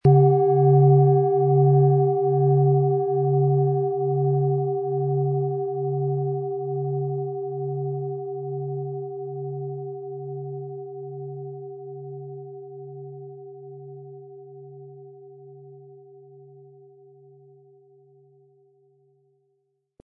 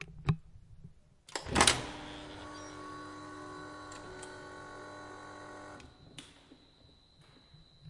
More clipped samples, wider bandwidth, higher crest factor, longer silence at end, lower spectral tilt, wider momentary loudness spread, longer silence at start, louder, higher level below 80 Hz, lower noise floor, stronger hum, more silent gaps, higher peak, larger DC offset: neither; second, 1.7 kHz vs 11.5 kHz; second, 18 dB vs 32 dB; first, 4.05 s vs 0 s; first, -14.5 dB/octave vs -2.5 dB/octave; about the same, 24 LU vs 25 LU; about the same, 0.05 s vs 0 s; first, -22 LUFS vs -36 LUFS; second, -64 dBFS vs -56 dBFS; first, -73 dBFS vs -62 dBFS; neither; neither; about the same, -6 dBFS vs -8 dBFS; neither